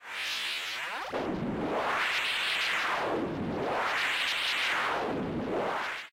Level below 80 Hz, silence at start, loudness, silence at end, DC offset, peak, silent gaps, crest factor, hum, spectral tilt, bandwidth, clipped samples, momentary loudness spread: -58 dBFS; 0 s; -30 LUFS; 0.05 s; under 0.1%; -20 dBFS; none; 12 dB; none; -3 dB/octave; 16 kHz; under 0.1%; 6 LU